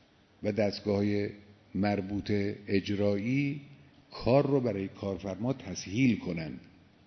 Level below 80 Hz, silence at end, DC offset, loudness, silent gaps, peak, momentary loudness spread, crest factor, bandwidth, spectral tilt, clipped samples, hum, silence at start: -60 dBFS; 0.45 s; under 0.1%; -31 LUFS; none; -12 dBFS; 11 LU; 20 dB; 6.4 kHz; -7 dB/octave; under 0.1%; none; 0.4 s